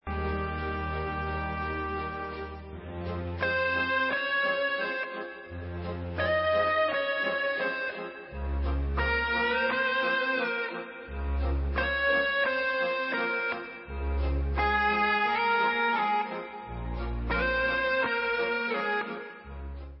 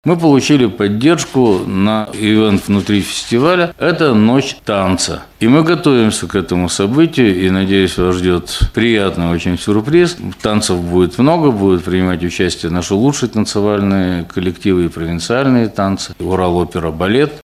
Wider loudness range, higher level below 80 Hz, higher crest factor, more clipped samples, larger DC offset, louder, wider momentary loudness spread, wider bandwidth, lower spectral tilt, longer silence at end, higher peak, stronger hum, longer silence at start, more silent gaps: about the same, 2 LU vs 3 LU; about the same, -38 dBFS vs -34 dBFS; about the same, 16 dB vs 12 dB; neither; neither; second, -29 LUFS vs -13 LUFS; first, 14 LU vs 6 LU; second, 5.8 kHz vs 15 kHz; first, -9 dB/octave vs -5.5 dB/octave; about the same, 0 s vs 0.05 s; second, -14 dBFS vs 0 dBFS; neither; about the same, 0.05 s vs 0.05 s; neither